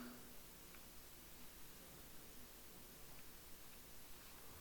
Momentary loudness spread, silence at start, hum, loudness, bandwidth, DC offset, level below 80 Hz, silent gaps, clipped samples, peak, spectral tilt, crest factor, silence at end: 1 LU; 0 s; none; -58 LUFS; 19 kHz; under 0.1%; -68 dBFS; none; under 0.1%; -42 dBFS; -2.5 dB/octave; 14 dB; 0 s